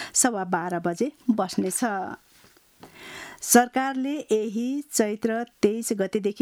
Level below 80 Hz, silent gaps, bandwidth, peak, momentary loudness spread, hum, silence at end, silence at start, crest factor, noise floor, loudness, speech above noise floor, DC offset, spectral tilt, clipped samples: -68 dBFS; none; over 20 kHz; -4 dBFS; 16 LU; none; 0 s; 0 s; 22 dB; -57 dBFS; -25 LUFS; 31 dB; under 0.1%; -3.5 dB/octave; under 0.1%